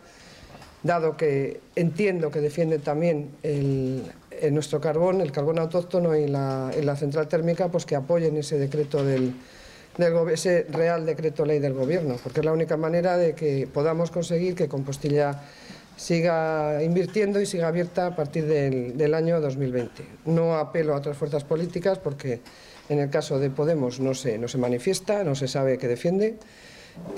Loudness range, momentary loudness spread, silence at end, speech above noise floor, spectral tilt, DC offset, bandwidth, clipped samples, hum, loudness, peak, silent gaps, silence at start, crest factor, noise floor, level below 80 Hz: 2 LU; 6 LU; 0 s; 24 dB; -6.5 dB/octave; under 0.1%; 14 kHz; under 0.1%; none; -25 LUFS; -12 dBFS; none; 0.2 s; 14 dB; -48 dBFS; -58 dBFS